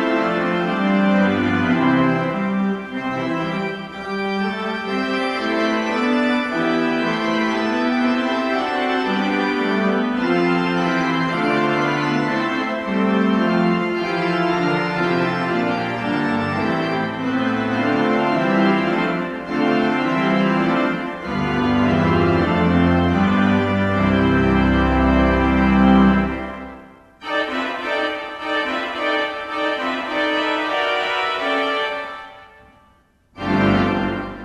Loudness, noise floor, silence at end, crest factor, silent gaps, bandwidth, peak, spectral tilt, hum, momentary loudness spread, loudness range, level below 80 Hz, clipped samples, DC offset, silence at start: -19 LUFS; -56 dBFS; 0 s; 16 dB; none; 10 kHz; -2 dBFS; -7 dB/octave; none; 7 LU; 5 LU; -36 dBFS; under 0.1%; under 0.1%; 0 s